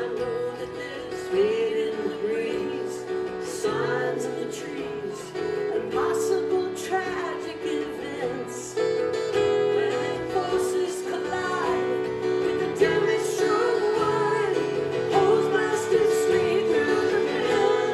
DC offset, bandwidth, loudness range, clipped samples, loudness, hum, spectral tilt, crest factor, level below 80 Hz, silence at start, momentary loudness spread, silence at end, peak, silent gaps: under 0.1%; 13.5 kHz; 5 LU; under 0.1%; -25 LUFS; none; -4.5 dB/octave; 16 dB; -60 dBFS; 0 s; 9 LU; 0 s; -8 dBFS; none